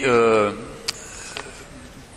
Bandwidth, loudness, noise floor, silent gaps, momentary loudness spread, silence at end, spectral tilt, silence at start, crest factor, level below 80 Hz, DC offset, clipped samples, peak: 13 kHz; -22 LUFS; -41 dBFS; none; 24 LU; 0 s; -4 dB/octave; 0 s; 20 dB; -48 dBFS; under 0.1%; under 0.1%; -2 dBFS